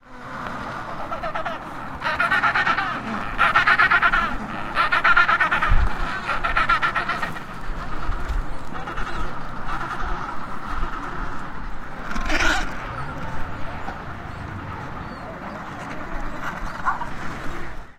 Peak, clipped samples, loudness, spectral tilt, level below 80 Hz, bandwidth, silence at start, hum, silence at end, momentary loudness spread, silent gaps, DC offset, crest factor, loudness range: -2 dBFS; under 0.1%; -23 LUFS; -4 dB/octave; -30 dBFS; 11.5 kHz; 0.05 s; none; 0.05 s; 17 LU; none; under 0.1%; 20 dB; 12 LU